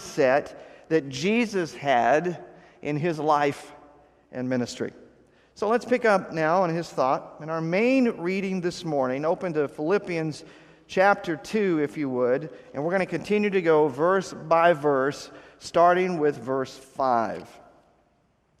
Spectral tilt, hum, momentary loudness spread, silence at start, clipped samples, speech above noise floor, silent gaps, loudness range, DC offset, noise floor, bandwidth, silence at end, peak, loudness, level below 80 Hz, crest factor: -6 dB/octave; none; 12 LU; 0 s; under 0.1%; 42 dB; none; 4 LU; under 0.1%; -66 dBFS; 13 kHz; 1.1 s; -6 dBFS; -25 LUFS; -66 dBFS; 20 dB